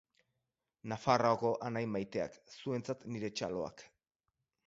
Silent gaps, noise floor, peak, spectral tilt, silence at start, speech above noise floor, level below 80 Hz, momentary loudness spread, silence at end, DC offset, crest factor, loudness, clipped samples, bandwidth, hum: none; -88 dBFS; -14 dBFS; -5 dB/octave; 0.85 s; 52 dB; -70 dBFS; 14 LU; 0.8 s; under 0.1%; 24 dB; -37 LUFS; under 0.1%; 7.6 kHz; none